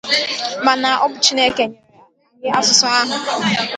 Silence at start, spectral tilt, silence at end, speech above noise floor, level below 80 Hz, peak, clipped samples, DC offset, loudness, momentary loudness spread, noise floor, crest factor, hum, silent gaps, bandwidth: 0.05 s; -1.5 dB/octave; 0 s; 34 dB; -60 dBFS; 0 dBFS; under 0.1%; under 0.1%; -15 LUFS; 9 LU; -51 dBFS; 18 dB; none; none; 11.5 kHz